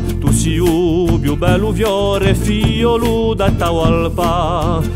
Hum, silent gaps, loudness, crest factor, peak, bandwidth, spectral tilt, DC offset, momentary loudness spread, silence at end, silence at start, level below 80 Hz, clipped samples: none; none; -15 LUFS; 14 dB; 0 dBFS; 16 kHz; -6 dB/octave; under 0.1%; 2 LU; 0 s; 0 s; -22 dBFS; under 0.1%